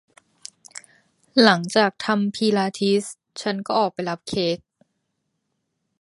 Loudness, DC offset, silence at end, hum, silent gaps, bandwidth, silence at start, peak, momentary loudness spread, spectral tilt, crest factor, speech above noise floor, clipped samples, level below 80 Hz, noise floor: -21 LUFS; under 0.1%; 1.45 s; none; none; 11.5 kHz; 0.75 s; 0 dBFS; 24 LU; -4.5 dB/octave; 24 dB; 55 dB; under 0.1%; -64 dBFS; -76 dBFS